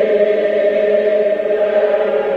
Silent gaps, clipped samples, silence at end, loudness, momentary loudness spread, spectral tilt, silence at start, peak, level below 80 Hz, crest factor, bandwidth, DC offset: none; under 0.1%; 0 s; -15 LUFS; 2 LU; -6.5 dB/octave; 0 s; -2 dBFS; -58 dBFS; 12 dB; 5.2 kHz; under 0.1%